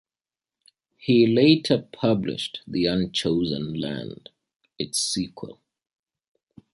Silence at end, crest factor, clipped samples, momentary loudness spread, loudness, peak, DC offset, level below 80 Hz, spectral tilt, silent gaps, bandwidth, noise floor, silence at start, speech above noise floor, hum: 1.2 s; 20 dB; under 0.1%; 16 LU; -23 LUFS; -6 dBFS; under 0.1%; -56 dBFS; -5 dB/octave; none; 12 kHz; under -90 dBFS; 1.05 s; over 67 dB; none